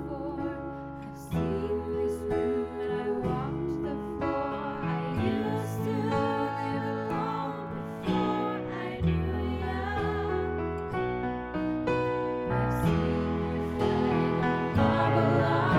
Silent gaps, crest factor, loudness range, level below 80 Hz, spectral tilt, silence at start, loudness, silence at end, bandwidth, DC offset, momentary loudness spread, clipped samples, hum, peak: none; 18 dB; 4 LU; -44 dBFS; -8 dB/octave; 0 s; -30 LUFS; 0 s; 15.5 kHz; under 0.1%; 8 LU; under 0.1%; none; -10 dBFS